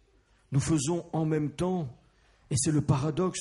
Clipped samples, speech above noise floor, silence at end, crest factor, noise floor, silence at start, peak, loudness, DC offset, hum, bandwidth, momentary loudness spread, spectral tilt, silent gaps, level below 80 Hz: under 0.1%; 37 dB; 0 s; 18 dB; -64 dBFS; 0.5 s; -12 dBFS; -29 LUFS; under 0.1%; none; 11.5 kHz; 6 LU; -6 dB/octave; none; -54 dBFS